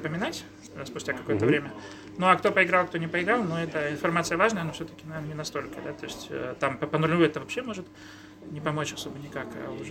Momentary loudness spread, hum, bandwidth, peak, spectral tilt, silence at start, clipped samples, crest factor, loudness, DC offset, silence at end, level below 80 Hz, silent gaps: 17 LU; none; 16.5 kHz; -4 dBFS; -5 dB/octave; 0 s; under 0.1%; 24 dB; -28 LUFS; under 0.1%; 0 s; -60 dBFS; none